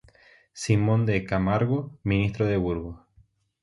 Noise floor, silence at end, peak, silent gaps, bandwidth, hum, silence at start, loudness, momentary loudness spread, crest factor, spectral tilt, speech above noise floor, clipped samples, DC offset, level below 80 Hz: -61 dBFS; 0.65 s; -8 dBFS; none; 11.5 kHz; none; 0.55 s; -25 LUFS; 9 LU; 18 dB; -7 dB/octave; 37 dB; under 0.1%; under 0.1%; -44 dBFS